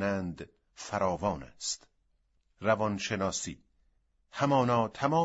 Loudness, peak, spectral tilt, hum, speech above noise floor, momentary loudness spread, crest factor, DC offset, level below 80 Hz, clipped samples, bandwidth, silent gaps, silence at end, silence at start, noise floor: -31 LUFS; -12 dBFS; -5 dB/octave; none; 42 dB; 18 LU; 20 dB; under 0.1%; -60 dBFS; under 0.1%; 8 kHz; none; 0 s; 0 s; -72 dBFS